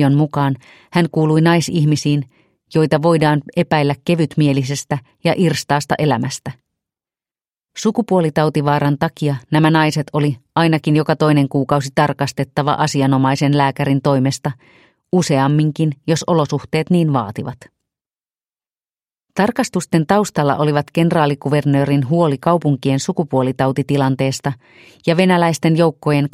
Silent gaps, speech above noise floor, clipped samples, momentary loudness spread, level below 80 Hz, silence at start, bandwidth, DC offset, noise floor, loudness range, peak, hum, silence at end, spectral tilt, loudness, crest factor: none; over 74 dB; under 0.1%; 7 LU; -54 dBFS; 0 s; 14 kHz; under 0.1%; under -90 dBFS; 4 LU; 0 dBFS; none; 0.05 s; -6.5 dB/octave; -16 LUFS; 16 dB